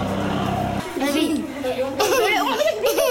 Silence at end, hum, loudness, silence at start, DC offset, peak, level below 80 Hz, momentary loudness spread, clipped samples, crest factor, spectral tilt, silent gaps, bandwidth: 0 s; none; -21 LUFS; 0 s; under 0.1%; -8 dBFS; -46 dBFS; 7 LU; under 0.1%; 14 dB; -4 dB/octave; none; 17 kHz